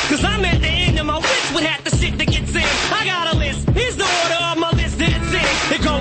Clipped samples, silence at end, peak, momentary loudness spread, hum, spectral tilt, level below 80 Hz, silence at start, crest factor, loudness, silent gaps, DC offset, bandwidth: under 0.1%; 0 s; -4 dBFS; 2 LU; none; -4 dB/octave; -26 dBFS; 0 s; 14 dB; -17 LUFS; none; under 0.1%; 8.8 kHz